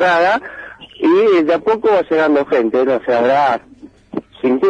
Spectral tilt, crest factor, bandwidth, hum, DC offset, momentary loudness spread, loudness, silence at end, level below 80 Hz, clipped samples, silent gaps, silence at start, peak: -6 dB/octave; 10 dB; 8.8 kHz; none; under 0.1%; 16 LU; -14 LUFS; 0 s; -54 dBFS; under 0.1%; none; 0 s; -4 dBFS